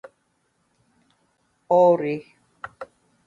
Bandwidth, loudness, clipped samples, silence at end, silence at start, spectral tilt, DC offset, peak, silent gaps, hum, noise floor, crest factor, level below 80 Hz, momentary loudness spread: 7.2 kHz; -20 LUFS; under 0.1%; 0.4 s; 1.7 s; -8 dB/octave; under 0.1%; -6 dBFS; none; none; -70 dBFS; 20 dB; -72 dBFS; 25 LU